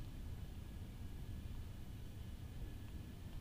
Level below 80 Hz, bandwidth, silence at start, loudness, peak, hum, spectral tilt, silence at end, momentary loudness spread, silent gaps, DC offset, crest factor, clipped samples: -52 dBFS; 15.5 kHz; 0 s; -52 LUFS; -38 dBFS; none; -6.5 dB/octave; 0 s; 2 LU; none; under 0.1%; 12 dB; under 0.1%